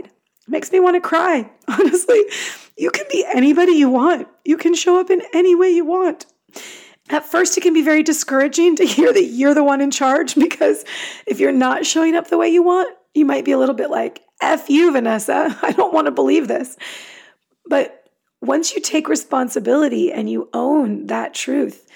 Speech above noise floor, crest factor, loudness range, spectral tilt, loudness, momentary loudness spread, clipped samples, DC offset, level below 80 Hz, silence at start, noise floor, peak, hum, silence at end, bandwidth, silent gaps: 33 dB; 12 dB; 5 LU; -3 dB/octave; -16 LUFS; 10 LU; under 0.1%; under 0.1%; -82 dBFS; 0.5 s; -48 dBFS; -4 dBFS; none; 0.25 s; 18 kHz; none